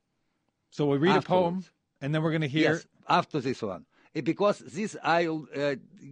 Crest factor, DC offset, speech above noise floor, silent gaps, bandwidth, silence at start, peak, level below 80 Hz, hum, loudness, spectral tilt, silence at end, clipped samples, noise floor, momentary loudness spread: 20 dB; under 0.1%; 49 dB; none; 9.8 kHz; 0.75 s; -10 dBFS; -70 dBFS; none; -28 LUFS; -6.5 dB/octave; 0 s; under 0.1%; -76 dBFS; 14 LU